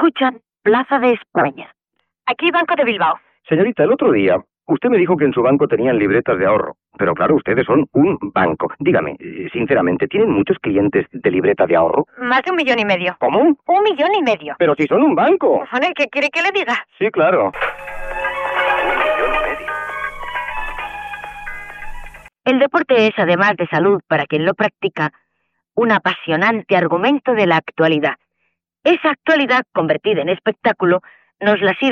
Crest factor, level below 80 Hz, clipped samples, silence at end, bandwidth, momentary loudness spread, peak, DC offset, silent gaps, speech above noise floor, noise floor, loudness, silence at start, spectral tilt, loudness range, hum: 14 dB; -44 dBFS; under 0.1%; 0 s; 8.8 kHz; 10 LU; -2 dBFS; under 0.1%; none; 56 dB; -71 dBFS; -16 LUFS; 0 s; -7 dB/octave; 4 LU; none